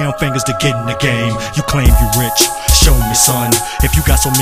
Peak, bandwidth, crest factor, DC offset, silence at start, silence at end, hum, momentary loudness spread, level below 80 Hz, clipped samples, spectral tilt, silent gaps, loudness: 0 dBFS; 16 kHz; 12 dB; under 0.1%; 0 s; 0 s; none; 6 LU; -16 dBFS; 0.1%; -3.5 dB/octave; none; -12 LUFS